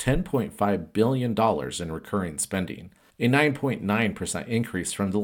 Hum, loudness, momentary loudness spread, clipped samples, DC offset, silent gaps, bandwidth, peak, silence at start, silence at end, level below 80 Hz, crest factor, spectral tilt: none; -26 LUFS; 8 LU; under 0.1%; under 0.1%; none; 17.5 kHz; -6 dBFS; 0 s; 0 s; -46 dBFS; 20 dB; -5 dB/octave